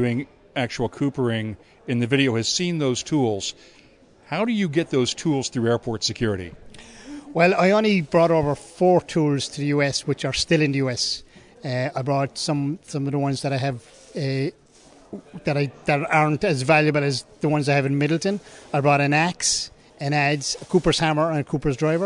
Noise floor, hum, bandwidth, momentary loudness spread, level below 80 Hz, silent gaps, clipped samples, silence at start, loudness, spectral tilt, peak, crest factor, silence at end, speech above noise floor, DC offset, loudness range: -51 dBFS; none; 11 kHz; 12 LU; -50 dBFS; none; under 0.1%; 0 s; -22 LUFS; -5 dB/octave; -4 dBFS; 18 dB; 0 s; 29 dB; under 0.1%; 5 LU